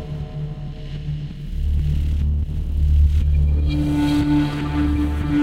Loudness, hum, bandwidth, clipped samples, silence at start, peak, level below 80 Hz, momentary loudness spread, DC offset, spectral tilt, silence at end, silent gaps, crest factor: -21 LUFS; none; 8.6 kHz; under 0.1%; 0 s; -8 dBFS; -22 dBFS; 12 LU; under 0.1%; -8 dB/octave; 0 s; none; 12 dB